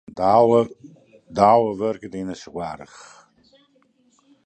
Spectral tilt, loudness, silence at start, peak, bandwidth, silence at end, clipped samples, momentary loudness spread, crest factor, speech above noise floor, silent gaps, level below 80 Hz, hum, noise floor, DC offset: -7 dB/octave; -20 LUFS; 0.15 s; -2 dBFS; 9.2 kHz; 1.6 s; under 0.1%; 17 LU; 20 dB; 41 dB; none; -58 dBFS; none; -61 dBFS; under 0.1%